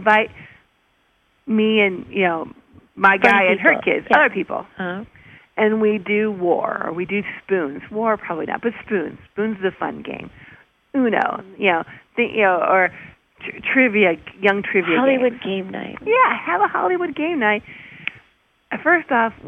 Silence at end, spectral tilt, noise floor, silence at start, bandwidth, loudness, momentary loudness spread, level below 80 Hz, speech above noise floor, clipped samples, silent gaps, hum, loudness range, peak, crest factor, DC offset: 0 s; -7 dB/octave; -62 dBFS; 0 s; 8.4 kHz; -19 LUFS; 13 LU; -60 dBFS; 43 dB; under 0.1%; none; none; 7 LU; -2 dBFS; 18 dB; under 0.1%